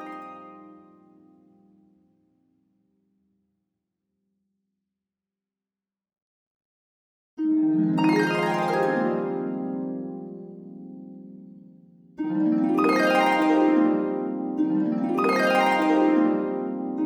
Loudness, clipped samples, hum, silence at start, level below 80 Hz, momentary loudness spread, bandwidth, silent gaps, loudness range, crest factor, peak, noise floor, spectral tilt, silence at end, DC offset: -23 LUFS; under 0.1%; none; 0 s; -78 dBFS; 21 LU; 13 kHz; 6.22-7.37 s; 10 LU; 16 dB; -10 dBFS; under -90 dBFS; -6.5 dB/octave; 0 s; under 0.1%